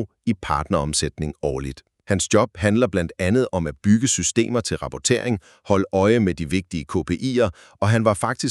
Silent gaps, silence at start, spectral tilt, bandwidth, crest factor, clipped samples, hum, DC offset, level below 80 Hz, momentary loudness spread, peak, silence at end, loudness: none; 0 s; -5 dB/octave; 12.5 kHz; 18 dB; under 0.1%; none; under 0.1%; -42 dBFS; 8 LU; -2 dBFS; 0 s; -21 LUFS